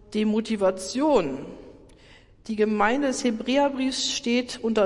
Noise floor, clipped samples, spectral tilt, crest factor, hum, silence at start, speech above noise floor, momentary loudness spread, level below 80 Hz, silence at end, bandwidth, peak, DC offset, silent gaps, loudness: -52 dBFS; under 0.1%; -4 dB/octave; 16 dB; none; 0.1 s; 28 dB; 10 LU; -54 dBFS; 0 s; 11.5 kHz; -8 dBFS; under 0.1%; none; -24 LUFS